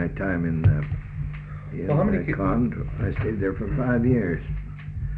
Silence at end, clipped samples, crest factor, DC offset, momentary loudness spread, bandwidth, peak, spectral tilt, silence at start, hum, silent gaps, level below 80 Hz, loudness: 0 s; under 0.1%; 18 dB; under 0.1%; 12 LU; 4.1 kHz; -8 dBFS; -11 dB/octave; 0 s; 50 Hz at -45 dBFS; none; -36 dBFS; -25 LUFS